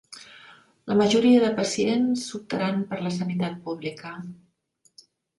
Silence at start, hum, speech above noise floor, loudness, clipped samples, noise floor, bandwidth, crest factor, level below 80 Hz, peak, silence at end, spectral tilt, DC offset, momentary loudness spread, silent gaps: 0.1 s; none; 43 dB; -24 LUFS; under 0.1%; -66 dBFS; 11.5 kHz; 18 dB; -66 dBFS; -8 dBFS; 1.05 s; -5.5 dB/octave; under 0.1%; 21 LU; none